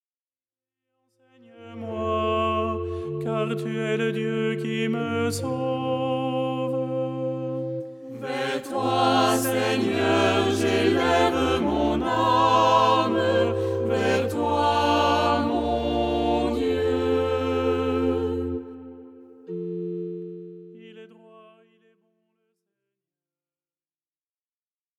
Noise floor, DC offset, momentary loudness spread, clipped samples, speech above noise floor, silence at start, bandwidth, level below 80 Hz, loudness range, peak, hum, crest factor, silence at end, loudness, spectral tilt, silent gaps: under -90 dBFS; under 0.1%; 12 LU; under 0.1%; over 67 dB; 1.55 s; 18 kHz; -46 dBFS; 11 LU; -6 dBFS; none; 18 dB; 3.55 s; -24 LUFS; -5.5 dB/octave; none